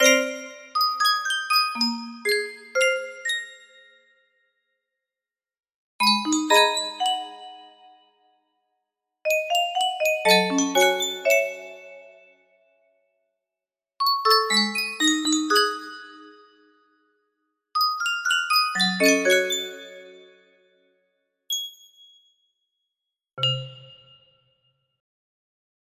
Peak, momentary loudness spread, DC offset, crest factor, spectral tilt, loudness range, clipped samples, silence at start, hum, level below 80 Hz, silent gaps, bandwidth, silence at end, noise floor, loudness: -4 dBFS; 16 LU; under 0.1%; 22 dB; -2 dB/octave; 11 LU; under 0.1%; 0 s; none; -76 dBFS; 5.74-5.99 s; 16 kHz; 2.15 s; under -90 dBFS; -22 LUFS